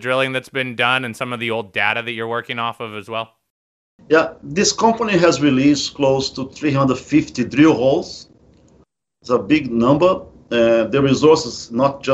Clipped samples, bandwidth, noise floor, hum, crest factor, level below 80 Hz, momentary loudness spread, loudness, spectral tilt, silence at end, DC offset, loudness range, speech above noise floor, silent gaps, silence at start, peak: under 0.1%; 11.5 kHz; -56 dBFS; none; 16 dB; -50 dBFS; 11 LU; -17 LUFS; -5 dB/octave; 0 s; under 0.1%; 5 LU; 39 dB; 3.50-3.98 s; 0 s; 0 dBFS